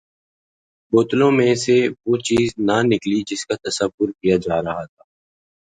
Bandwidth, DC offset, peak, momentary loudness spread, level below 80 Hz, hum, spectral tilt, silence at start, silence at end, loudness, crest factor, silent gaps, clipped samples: 9.6 kHz; under 0.1%; -2 dBFS; 9 LU; -52 dBFS; none; -5 dB/octave; 0.9 s; 0.9 s; -19 LUFS; 16 dB; 3.94-3.98 s; under 0.1%